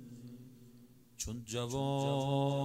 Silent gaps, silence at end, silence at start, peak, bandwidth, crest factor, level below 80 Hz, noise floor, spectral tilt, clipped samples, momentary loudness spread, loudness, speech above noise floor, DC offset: none; 0 s; 0 s; -22 dBFS; 16 kHz; 14 dB; -60 dBFS; -60 dBFS; -5.5 dB/octave; under 0.1%; 20 LU; -36 LUFS; 26 dB; under 0.1%